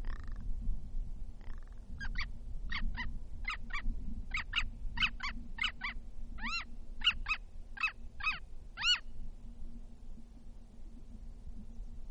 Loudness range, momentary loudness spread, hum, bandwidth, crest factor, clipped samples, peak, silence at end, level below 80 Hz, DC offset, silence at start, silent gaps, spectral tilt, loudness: 8 LU; 22 LU; none; 8.2 kHz; 18 dB; under 0.1%; -18 dBFS; 0 s; -42 dBFS; under 0.1%; 0 s; none; -2 dB/octave; -38 LUFS